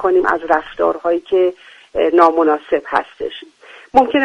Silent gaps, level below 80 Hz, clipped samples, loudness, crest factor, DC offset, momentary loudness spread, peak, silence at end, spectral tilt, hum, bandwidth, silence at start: none; -50 dBFS; under 0.1%; -16 LUFS; 16 dB; under 0.1%; 14 LU; 0 dBFS; 0 s; -5.5 dB/octave; none; 8.6 kHz; 0 s